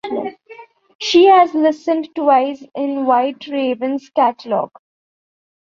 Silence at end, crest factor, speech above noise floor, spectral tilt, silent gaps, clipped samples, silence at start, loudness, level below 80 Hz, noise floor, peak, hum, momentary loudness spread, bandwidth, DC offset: 1 s; 16 dB; 26 dB; -4 dB/octave; 0.95-0.99 s; under 0.1%; 0.05 s; -16 LUFS; -64 dBFS; -41 dBFS; -2 dBFS; none; 14 LU; 7.4 kHz; under 0.1%